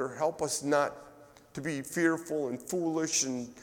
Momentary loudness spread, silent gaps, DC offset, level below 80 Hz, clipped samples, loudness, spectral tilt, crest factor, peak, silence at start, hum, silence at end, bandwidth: 8 LU; none; under 0.1%; -68 dBFS; under 0.1%; -31 LUFS; -3.5 dB/octave; 18 dB; -14 dBFS; 0 s; none; 0 s; 18 kHz